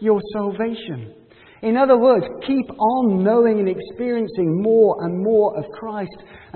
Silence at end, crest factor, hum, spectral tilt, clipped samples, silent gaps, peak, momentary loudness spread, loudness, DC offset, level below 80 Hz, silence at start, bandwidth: 0.2 s; 16 dB; none; -12 dB/octave; under 0.1%; none; -2 dBFS; 14 LU; -19 LUFS; under 0.1%; -58 dBFS; 0 s; 4.4 kHz